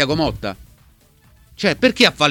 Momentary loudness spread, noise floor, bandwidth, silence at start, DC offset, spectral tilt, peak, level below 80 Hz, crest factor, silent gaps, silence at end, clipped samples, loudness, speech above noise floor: 16 LU; -52 dBFS; 18 kHz; 0 s; under 0.1%; -4 dB/octave; 0 dBFS; -42 dBFS; 20 dB; none; 0 s; under 0.1%; -17 LUFS; 35 dB